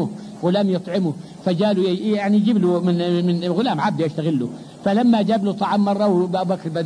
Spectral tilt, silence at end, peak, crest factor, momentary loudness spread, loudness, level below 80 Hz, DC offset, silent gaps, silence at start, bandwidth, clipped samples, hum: -7.5 dB/octave; 0 s; -8 dBFS; 12 dB; 8 LU; -20 LUFS; -64 dBFS; under 0.1%; none; 0 s; 10.5 kHz; under 0.1%; none